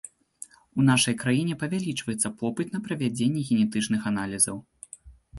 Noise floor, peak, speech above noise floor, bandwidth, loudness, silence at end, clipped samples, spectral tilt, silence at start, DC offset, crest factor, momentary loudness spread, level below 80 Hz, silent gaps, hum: -49 dBFS; -6 dBFS; 24 dB; 12 kHz; -26 LUFS; 0 s; under 0.1%; -4 dB/octave; 0.05 s; under 0.1%; 20 dB; 22 LU; -58 dBFS; none; none